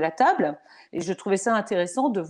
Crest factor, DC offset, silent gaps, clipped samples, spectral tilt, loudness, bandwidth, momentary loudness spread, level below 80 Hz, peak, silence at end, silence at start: 16 dB; under 0.1%; none; under 0.1%; -5 dB/octave; -24 LUFS; 11 kHz; 12 LU; -72 dBFS; -8 dBFS; 0 s; 0 s